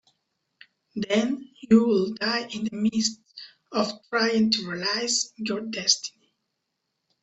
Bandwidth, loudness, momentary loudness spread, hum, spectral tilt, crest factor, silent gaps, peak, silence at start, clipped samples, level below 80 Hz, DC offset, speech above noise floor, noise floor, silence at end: 8.4 kHz; -25 LUFS; 13 LU; none; -3 dB/octave; 22 dB; none; -4 dBFS; 0.95 s; under 0.1%; -66 dBFS; under 0.1%; 55 dB; -80 dBFS; 1.15 s